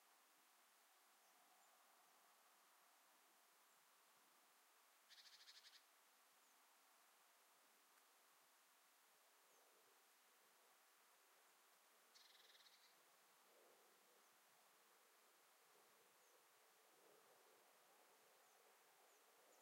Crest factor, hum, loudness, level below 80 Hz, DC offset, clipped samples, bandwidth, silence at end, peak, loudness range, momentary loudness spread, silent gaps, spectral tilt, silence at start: 22 dB; none; -67 LUFS; under -90 dBFS; under 0.1%; under 0.1%; 16 kHz; 0 s; -52 dBFS; 0 LU; 4 LU; none; 0.5 dB/octave; 0 s